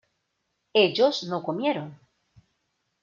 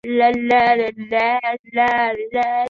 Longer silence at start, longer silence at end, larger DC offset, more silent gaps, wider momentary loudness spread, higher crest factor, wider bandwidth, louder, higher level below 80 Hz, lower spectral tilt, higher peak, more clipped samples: first, 0.75 s vs 0.05 s; first, 1.1 s vs 0 s; neither; second, none vs 1.59-1.64 s; first, 11 LU vs 7 LU; first, 22 dB vs 16 dB; about the same, 7.4 kHz vs 7.2 kHz; second, -24 LUFS vs -18 LUFS; second, -76 dBFS vs -56 dBFS; about the same, -5 dB/octave vs -5.5 dB/octave; second, -6 dBFS vs -2 dBFS; neither